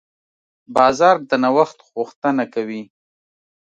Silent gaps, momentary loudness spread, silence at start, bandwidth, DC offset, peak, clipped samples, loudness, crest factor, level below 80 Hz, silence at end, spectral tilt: 2.16-2.22 s; 14 LU; 0.7 s; 9.8 kHz; under 0.1%; 0 dBFS; under 0.1%; -18 LUFS; 20 dB; -60 dBFS; 0.85 s; -5 dB/octave